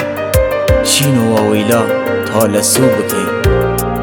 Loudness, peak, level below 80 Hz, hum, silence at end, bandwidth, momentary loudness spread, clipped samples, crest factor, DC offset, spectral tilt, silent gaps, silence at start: -12 LUFS; 0 dBFS; -26 dBFS; none; 0 s; over 20 kHz; 5 LU; under 0.1%; 12 dB; under 0.1%; -4.5 dB/octave; none; 0 s